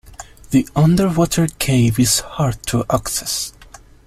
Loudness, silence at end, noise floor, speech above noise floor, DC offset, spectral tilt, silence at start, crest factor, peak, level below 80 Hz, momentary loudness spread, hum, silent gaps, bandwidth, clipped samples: -17 LUFS; 0.45 s; -43 dBFS; 26 dB; under 0.1%; -5 dB/octave; 0.05 s; 16 dB; -2 dBFS; -38 dBFS; 7 LU; none; none; 15 kHz; under 0.1%